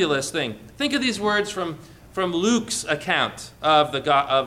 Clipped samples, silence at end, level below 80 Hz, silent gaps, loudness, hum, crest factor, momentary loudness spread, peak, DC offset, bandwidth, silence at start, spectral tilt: under 0.1%; 0 s; -54 dBFS; none; -22 LUFS; none; 16 dB; 11 LU; -6 dBFS; under 0.1%; 16 kHz; 0 s; -3.5 dB/octave